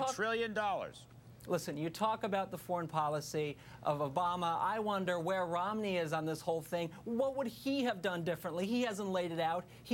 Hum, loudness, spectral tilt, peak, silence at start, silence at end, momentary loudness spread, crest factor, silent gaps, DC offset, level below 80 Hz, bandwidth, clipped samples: none; -36 LUFS; -5 dB/octave; -20 dBFS; 0 s; 0 s; 5 LU; 16 dB; none; under 0.1%; -70 dBFS; 17 kHz; under 0.1%